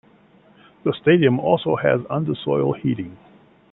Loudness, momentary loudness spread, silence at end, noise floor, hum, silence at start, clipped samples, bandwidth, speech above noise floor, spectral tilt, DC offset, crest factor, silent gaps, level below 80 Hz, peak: -20 LUFS; 10 LU; 0.55 s; -53 dBFS; none; 0.85 s; under 0.1%; 4.1 kHz; 33 dB; -11.5 dB/octave; under 0.1%; 18 dB; none; -58 dBFS; -2 dBFS